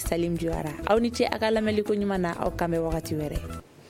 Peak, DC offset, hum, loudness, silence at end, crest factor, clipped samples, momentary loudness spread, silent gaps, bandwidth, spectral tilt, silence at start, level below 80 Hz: -6 dBFS; under 0.1%; none; -27 LUFS; 0 s; 20 dB; under 0.1%; 7 LU; none; 16.5 kHz; -6 dB/octave; 0 s; -40 dBFS